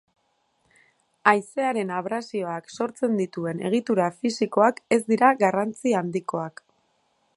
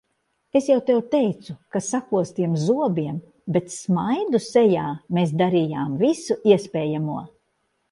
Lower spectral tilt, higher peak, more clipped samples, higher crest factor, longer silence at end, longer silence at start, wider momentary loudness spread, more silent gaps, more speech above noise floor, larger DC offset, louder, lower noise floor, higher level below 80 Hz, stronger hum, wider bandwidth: about the same, -5.5 dB/octave vs -6.5 dB/octave; about the same, -2 dBFS vs -4 dBFS; neither; first, 24 dB vs 18 dB; first, 0.85 s vs 0.65 s; first, 1.25 s vs 0.55 s; about the same, 10 LU vs 9 LU; neither; second, 46 dB vs 51 dB; neither; about the same, -24 LUFS vs -22 LUFS; about the same, -70 dBFS vs -72 dBFS; second, -74 dBFS vs -64 dBFS; neither; about the same, 11.5 kHz vs 11.5 kHz